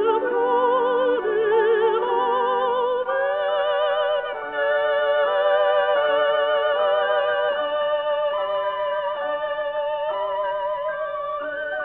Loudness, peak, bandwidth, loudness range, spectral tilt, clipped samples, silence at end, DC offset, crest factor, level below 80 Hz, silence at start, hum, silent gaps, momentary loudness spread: -22 LUFS; -8 dBFS; 4.1 kHz; 4 LU; -6 dB/octave; under 0.1%; 0 s; under 0.1%; 14 dB; -62 dBFS; 0 s; none; none; 6 LU